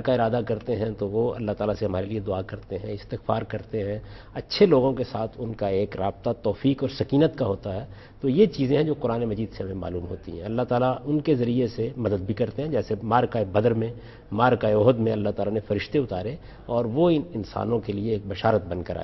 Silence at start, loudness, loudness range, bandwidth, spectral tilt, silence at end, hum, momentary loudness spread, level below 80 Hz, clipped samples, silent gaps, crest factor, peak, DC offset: 0 s; -25 LUFS; 4 LU; 6 kHz; -9 dB/octave; 0 s; none; 12 LU; -48 dBFS; under 0.1%; none; 20 dB; -6 dBFS; under 0.1%